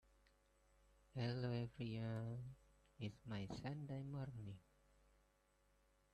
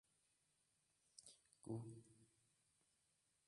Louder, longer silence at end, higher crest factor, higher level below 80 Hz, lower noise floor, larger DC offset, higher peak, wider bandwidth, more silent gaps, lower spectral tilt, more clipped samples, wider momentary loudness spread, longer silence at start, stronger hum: first, -49 LUFS vs -57 LUFS; first, 1.55 s vs 1.2 s; second, 18 dB vs 24 dB; first, -72 dBFS vs -90 dBFS; second, -79 dBFS vs -85 dBFS; neither; first, -34 dBFS vs -38 dBFS; second, 9 kHz vs 11 kHz; neither; about the same, -7.5 dB/octave vs -6.5 dB/octave; neither; second, 11 LU vs 14 LU; about the same, 1.15 s vs 1.15 s; neither